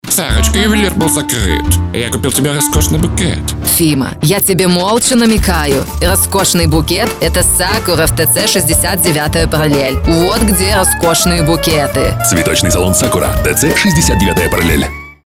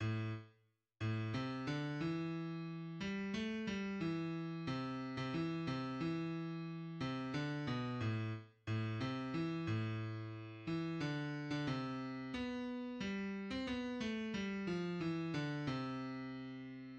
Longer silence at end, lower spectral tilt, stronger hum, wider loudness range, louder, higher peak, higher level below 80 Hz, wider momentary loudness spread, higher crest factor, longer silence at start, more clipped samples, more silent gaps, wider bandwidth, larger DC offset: first, 0.15 s vs 0 s; second, -4 dB/octave vs -7 dB/octave; neither; about the same, 2 LU vs 1 LU; first, -11 LUFS vs -42 LUFS; first, 0 dBFS vs -28 dBFS; first, -20 dBFS vs -68 dBFS; about the same, 4 LU vs 5 LU; about the same, 10 dB vs 14 dB; about the same, 0.05 s vs 0 s; neither; neither; first, 17.5 kHz vs 8.6 kHz; neither